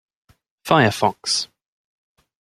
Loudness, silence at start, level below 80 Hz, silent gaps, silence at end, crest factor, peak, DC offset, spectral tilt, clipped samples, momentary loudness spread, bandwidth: -19 LUFS; 0.65 s; -60 dBFS; none; 0.95 s; 22 dB; -2 dBFS; under 0.1%; -4 dB/octave; under 0.1%; 16 LU; 15.5 kHz